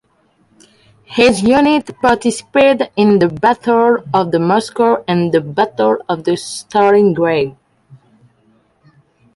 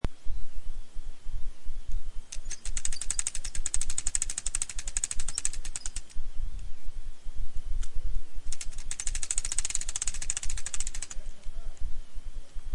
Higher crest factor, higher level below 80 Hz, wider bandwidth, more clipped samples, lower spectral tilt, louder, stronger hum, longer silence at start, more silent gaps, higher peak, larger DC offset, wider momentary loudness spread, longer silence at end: about the same, 14 dB vs 16 dB; second, -50 dBFS vs -34 dBFS; about the same, 11.5 kHz vs 11.5 kHz; neither; first, -5.5 dB/octave vs -1 dB/octave; first, -13 LUFS vs -34 LUFS; neither; first, 1.1 s vs 0.05 s; neither; first, 0 dBFS vs -8 dBFS; neither; second, 7 LU vs 16 LU; first, 1.85 s vs 0 s